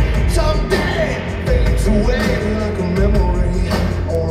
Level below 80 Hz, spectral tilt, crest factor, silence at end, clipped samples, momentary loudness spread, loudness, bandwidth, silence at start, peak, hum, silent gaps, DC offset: -18 dBFS; -6.5 dB/octave; 12 dB; 0 s; under 0.1%; 3 LU; -17 LUFS; 13.5 kHz; 0 s; -2 dBFS; none; none; under 0.1%